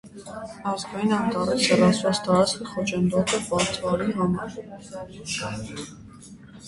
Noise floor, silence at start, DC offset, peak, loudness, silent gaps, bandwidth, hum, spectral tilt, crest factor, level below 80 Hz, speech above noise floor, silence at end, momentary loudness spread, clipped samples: -45 dBFS; 0.05 s; under 0.1%; -6 dBFS; -24 LUFS; none; 11.5 kHz; none; -4.5 dB/octave; 20 dB; -52 dBFS; 20 dB; 0 s; 19 LU; under 0.1%